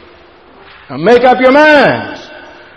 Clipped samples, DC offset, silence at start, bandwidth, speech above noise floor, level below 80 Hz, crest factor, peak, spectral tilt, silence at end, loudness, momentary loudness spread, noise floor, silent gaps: 0.3%; under 0.1%; 0.9 s; 9 kHz; 33 dB; -46 dBFS; 10 dB; 0 dBFS; -5.5 dB/octave; 0.4 s; -7 LUFS; 21 LU; -40 dBFS; none